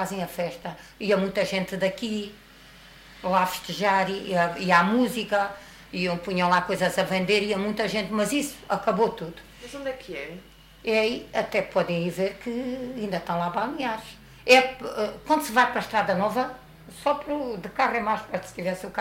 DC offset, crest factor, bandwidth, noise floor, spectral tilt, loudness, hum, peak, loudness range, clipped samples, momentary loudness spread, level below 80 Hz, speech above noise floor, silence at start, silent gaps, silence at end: under 0.1%; 20 dB; 16 kHz; -49 dBFS; -4.5 dB/octave; -25 LUFS; none; -6 dBFS; 5 LU; under 0.1%; 13 LU; -56 dBFS; 24 dB; 0 s; none; 0 s